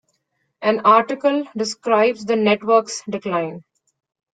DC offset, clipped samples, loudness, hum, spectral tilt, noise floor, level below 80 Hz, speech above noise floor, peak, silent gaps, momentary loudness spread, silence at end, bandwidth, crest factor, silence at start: under 0.1%; under 0.1%; -19 LUFS; none; -4.5 dB/octave; -71 dBFS; -68 dBFS; 53 dB; -2 dBFS; none; 10 LU; 0.75 s; 9.4 kHz; 18 dB; 0.6 s